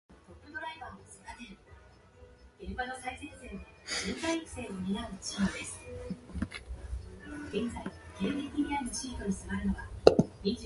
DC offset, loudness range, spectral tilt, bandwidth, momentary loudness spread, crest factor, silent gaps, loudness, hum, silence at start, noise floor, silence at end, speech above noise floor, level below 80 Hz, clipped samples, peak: under 0.1%; 12 LU; -5 dB/octave; 11.5 kHz; 15 LU; 34 dB; none; -34 LUFS; none; 0.1 s; -56 dBFS; 0 s; 21 dB; -48 dBFS; under 0.1%; 0 dBFS